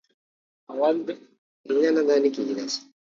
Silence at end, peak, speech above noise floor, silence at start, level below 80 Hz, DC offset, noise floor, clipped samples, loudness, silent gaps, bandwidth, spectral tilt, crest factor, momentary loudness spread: 0.25 s; -10 dBFS; over 67 dB; 0.7 s; -80 dBFS; under 0.1%; under -90 dBFS; under 0.1%; -24 LUFS; 1.38-1.64 s; 7.6 kHz; -3.5 dB/octave; 16 dB; 15 LU